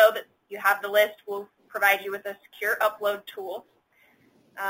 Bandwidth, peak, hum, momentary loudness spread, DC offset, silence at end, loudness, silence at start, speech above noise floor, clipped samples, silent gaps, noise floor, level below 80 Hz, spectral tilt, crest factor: 17 kHz; -6 dBFS; none; 16 LU; under 0.1%; 0 s; -26 LUFS; 0 s; 36 dB; under 0.1%; none; -62 dBFS; -78 dBFS; -1.5 dB/octave; 22 dB